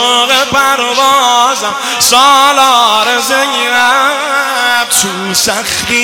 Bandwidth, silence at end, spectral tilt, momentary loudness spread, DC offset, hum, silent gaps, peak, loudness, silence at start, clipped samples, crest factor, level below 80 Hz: over 20 kHz; 0 s; -0.5 dB/octave; 5 LU; 0.2%; none; none; 0 dBFS; -8 LUFS; 0 s; 2%; 10 dB; -48 dBFS